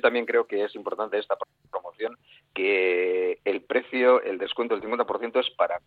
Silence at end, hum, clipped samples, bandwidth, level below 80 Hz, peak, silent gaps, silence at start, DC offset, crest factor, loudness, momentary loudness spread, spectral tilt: 0.1 s; none; under 0.1%; 4.7 kHz; -72 dBFS; -8 dBFS; none; 0.05 s; under 0.1%; 18 dB; -26 LUFS; 13 LU; -6 dB/octave